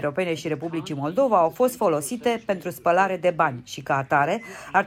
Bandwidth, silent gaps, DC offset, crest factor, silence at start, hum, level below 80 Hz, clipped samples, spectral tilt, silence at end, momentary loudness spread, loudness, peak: 16 kHz; none; under 0.1%; 16 dB; 0 s; none; -62 dBFS; under 0.1%; -5 dB/octave; 0 s; 8 LU; -23 LUFS; -6 dBFS